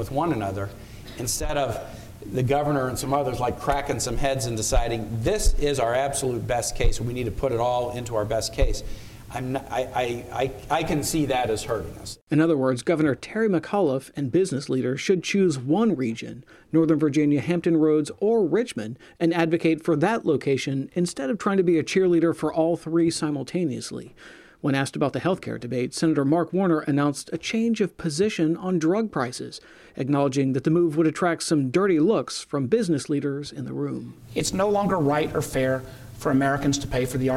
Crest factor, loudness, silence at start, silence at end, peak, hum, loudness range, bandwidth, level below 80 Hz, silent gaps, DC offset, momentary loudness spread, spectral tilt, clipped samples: 16 dB; -24 LUFS; 0 s; 0 s; -8 dBFS; none; 4 LU; 16 kHz; -36 dBFS; 12.22-12.27 s; under 0.1%; 9 LU; -5.5 dB/octave; under 0.1%